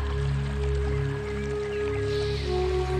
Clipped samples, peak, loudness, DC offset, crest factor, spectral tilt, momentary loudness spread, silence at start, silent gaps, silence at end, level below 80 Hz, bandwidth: under 0.1%; -16 dBFS; -28 LUFS; under 0.1%; 12 dB; -7 dB/octave; 3 LU; 0 s; none; 0 s; -32 dBFS; 9.6 kHz